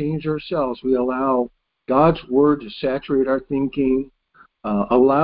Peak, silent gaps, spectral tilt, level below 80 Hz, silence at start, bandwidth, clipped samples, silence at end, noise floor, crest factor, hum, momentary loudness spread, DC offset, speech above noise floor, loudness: -2 dBFS; none; -12 dB/octave; -46 dBFS; 0 s; 5.2 kHz; under 0.1%; 0 s; -54 dBFS; 16 dB; none; 8 LU; under 0.1%; 36 dB; -20 LUFS